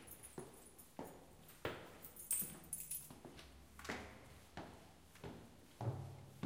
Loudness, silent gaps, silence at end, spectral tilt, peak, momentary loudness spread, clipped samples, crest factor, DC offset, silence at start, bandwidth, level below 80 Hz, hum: -49 LUFS; none; 0 s; -3.5 dB/octave; -24 dBFS; 19 LU; under 0.1%; 26 dB; under 0.1%; 0 s; 16.5 kHz; -68 dBFS; none